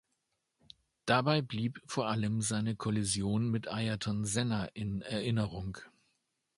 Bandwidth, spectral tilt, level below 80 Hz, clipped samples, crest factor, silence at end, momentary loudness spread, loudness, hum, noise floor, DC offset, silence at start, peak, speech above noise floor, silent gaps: 11.5 kHz; -5 dB/octave; -58 dBFS; under 0.1%; 22 dB; 0.7 s; 7 LU; -34 LUFS; none; -82 dBFS; under 0.1%; 1.05 s; -12 dBFS; 49 dB; none